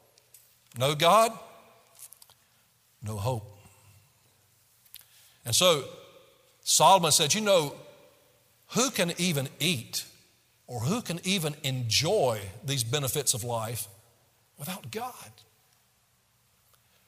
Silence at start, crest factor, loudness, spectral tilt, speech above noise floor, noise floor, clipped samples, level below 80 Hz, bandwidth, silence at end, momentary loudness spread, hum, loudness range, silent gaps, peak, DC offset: 0.75 s; 22 dB; -26 LUFS; -3 dB/octave; 41 dB; -68 dBFS; under 0.1%; -68 dBFS; 16 kHz; 1.75 s; 21 LU; none; 16 LU; none; -8 dBFS; under 0.1%